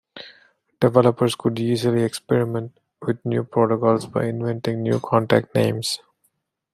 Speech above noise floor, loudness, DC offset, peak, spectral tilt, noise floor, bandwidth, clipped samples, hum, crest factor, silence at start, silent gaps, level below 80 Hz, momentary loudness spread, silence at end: 49 dB; -21 LUFS; under 0.1%; -2 dBFS; -6.5 dB/octave; -69 dBFS; 15 kHz; under 0.1%; none; 20 dB; 0.15 s; none; -62 dBFS; 10 LU; 0.75 s